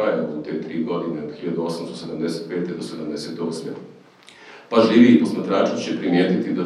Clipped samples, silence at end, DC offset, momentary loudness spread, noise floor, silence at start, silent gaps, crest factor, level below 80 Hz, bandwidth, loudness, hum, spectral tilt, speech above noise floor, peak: under 0.1%; 0 s; under 0.1%; 15 LU; -47 dBFS; 0 s; none; 20 dB; -66 dBFS; 11.5 kHz; -21 LUFS; none; -6.5 dB/octave; 27 dB; -2 dBFS